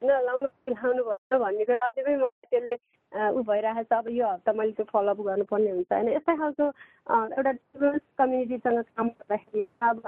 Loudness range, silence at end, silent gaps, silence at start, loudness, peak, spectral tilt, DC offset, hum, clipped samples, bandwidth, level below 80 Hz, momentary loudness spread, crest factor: 1 LU; 0 s; 1.18-1.30 s, 2.32-2.42 s; 0 s; -27 LUFS; -10 dBFS; -9 dB/octave; under 0.1%; none; under 0.1%; 3.9 kHz; -70 dBFS; 5 LU; 16 dB